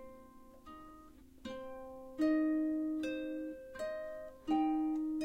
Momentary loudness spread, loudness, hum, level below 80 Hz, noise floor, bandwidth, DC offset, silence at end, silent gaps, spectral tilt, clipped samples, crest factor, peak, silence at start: 22 LU; -37 LUFS; none; -64 dBFS; -57 dBFS; 9.6 kHz; under 0.1%; 0 s; none; -5.5 dB/octave; under 0.1%; 14 dB; -24 dBFS; 0 s